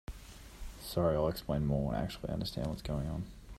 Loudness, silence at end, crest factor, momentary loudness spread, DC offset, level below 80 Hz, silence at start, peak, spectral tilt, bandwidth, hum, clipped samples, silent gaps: -35 LUFS; 0 s; 18 dB; 19 LU; under 0.1%; -46 dBFS; 0.1 s; -18 dBFS; -7 dB/octave; 15.5 kHz; none; under 0.1%; none